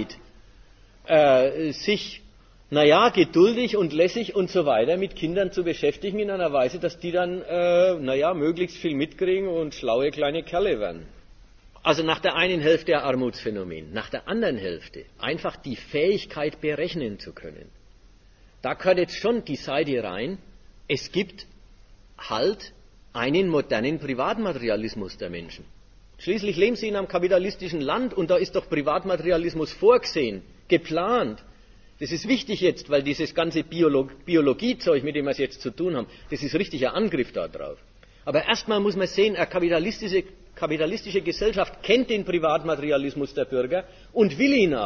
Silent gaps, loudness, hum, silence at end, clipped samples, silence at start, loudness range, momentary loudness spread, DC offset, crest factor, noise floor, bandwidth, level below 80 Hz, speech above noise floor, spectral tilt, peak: none; -24 LUFS; none; 0 s; under 0.1%; 0 s; 7 LU; 13 LU; under 0.1%; 20 dB; -53 dBFS; 7 kHz; -52 dBFS; 29 dB; -5.5 dB/octave; -4 dBFS